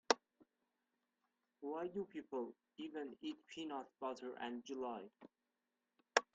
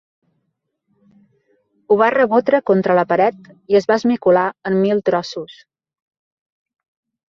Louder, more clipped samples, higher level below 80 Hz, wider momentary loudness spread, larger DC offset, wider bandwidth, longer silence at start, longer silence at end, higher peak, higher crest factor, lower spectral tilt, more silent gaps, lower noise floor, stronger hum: second, -46 LUFS vs -16 LUFS; neither; second, -88 dBFS vs -62 dBFS; first, 12 LU vs 6 LU; neither; first, 8.8 kHz vs 7.2 kHz; second, 0.1 s vs 1.9 s; second, 0.1 s vs 1.75 s; second, -14 dBFS vs -2 dBFS; first, 32 dB vs 18 dB; second, -2.5 dB/octave vs -7 dB/octave; neither; first, under -90 dBFS vs -73 dBFS; neither